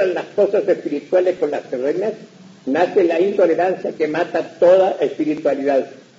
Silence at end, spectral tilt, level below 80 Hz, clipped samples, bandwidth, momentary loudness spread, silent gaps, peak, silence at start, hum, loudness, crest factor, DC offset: 0.2 s; -6.5 dB/octave; -70 dBFS; under 0.1%; 7.6 kHz; 8 LU; none; -2 dBFS; 0 s; none; -18 LUFS; 16 dB; under 0.1%